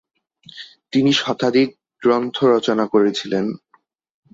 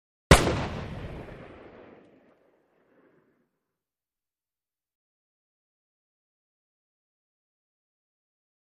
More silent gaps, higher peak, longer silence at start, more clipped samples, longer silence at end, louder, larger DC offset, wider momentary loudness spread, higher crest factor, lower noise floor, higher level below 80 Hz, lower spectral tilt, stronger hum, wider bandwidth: neither; about the same, -4 dBFS vs -2 dBFS; first, 0.55 s vs 0.3 s; neither; second, 0.75 s vs 7.2 s; first, -18 LUFS vs -23 LUFS; neither; second, 18 LU vs 26 LU; second, 16 dB vs 30 dB; second, -60 dBFS vs under -90 dBFS; second, -64 dBFS vs -40 dBFS; about the same, -5.5 dB/octave vs -4.5 dB/octave; neither; second, 7.8 kHz vs 13 kHz